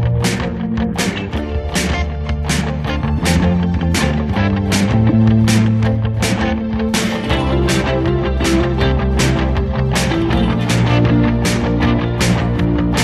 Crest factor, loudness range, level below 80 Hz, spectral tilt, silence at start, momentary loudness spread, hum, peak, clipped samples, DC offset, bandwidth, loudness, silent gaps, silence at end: 14 dB; 3 LU; -24 dBFS; -5.5 dB/octave; 0 s; 6 LU; none; -2 dBFS; under 0.1%; under 0.1%; 13.5 kHz; -16 LUFS; none; 0 s